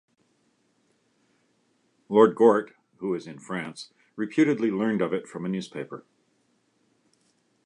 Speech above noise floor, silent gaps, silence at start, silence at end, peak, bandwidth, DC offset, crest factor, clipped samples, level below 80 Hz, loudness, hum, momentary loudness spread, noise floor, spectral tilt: 45 dB; none; 2.1 s; 1.65 s; -4 dBFS; 10.5 kHz; under 0.1%; 24 dB; under 0.1%; -74 dBFS; -25 LUFS; none; 19 LU; -69 dBFS; -7 dB/octave